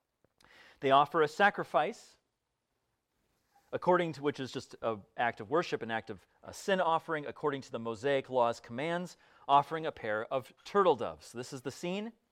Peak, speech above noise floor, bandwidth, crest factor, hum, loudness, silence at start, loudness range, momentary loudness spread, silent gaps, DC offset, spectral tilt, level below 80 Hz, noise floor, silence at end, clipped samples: -12 dBFS; 51 dB; 15.5 kHz; 22 dB; none; -32 LUFS; 0.8 s; 4 LU; 14 LU; none; under 0.1%; -5 dB/octave; -74 dBFS; -84 dBFS; 0.2 s; under 0.1%